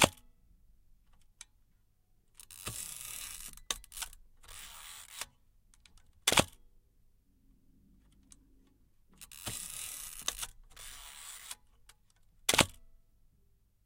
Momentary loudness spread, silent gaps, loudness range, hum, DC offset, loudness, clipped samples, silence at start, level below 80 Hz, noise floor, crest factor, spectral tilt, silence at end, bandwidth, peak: 24 LU; none; 10 LU; none; under 0.1%; -35 LUFS; under 0.1%; 0 s; -58 dBFS; -69 dBFS; 36 dB; -2 dB/octave; 0.9 s; 17 kHz; -4 dBFS